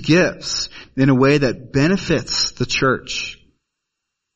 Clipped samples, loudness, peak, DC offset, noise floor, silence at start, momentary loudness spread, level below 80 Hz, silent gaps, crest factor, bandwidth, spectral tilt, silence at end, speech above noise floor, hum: under 0.1%; -18 LUFS; -2 dBFS; under 0.1%; -79 dBFS; 0 s; 10 LU; -42 dBFS; none; 18 dB; 8.4 kHz; -5 dB/octave; 1 s; 62 dB; none